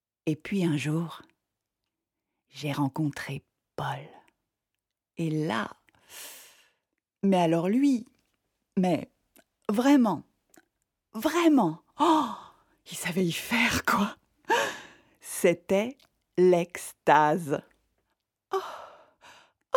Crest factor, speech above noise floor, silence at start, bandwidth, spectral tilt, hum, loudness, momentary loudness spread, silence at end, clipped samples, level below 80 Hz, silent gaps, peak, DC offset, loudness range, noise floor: 24 dB; 61 dB; 0.25 s; 18.5 kHz; -5.5 dB/octave; none; -27 LUFS; 20 LU; 0 s; under 0.1%; -64 dBFS; none; -6 dBFS; under 0.1%; 9 LU; -87 dBFS